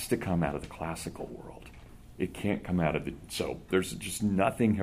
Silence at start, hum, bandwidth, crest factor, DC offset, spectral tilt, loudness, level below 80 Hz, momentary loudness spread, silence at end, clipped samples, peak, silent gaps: 0 s; none; 15.5 kHz; 20 dB; under 0.1%; -5.5 dB/octave; -32 LUFS; -50 dBFS; 15 LU; 0 s; under 0.1%; -12 dBFS; none